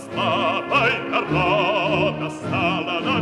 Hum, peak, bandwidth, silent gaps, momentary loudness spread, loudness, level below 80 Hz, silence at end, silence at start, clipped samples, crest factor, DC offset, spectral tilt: none; -6 dBFS; 12 kHz; none; 4 LU; -20 LUFS; -50 dBFS; 0 s; 0 s; under 0.1%; 16 dB; under 0.1%; -6 dB/octave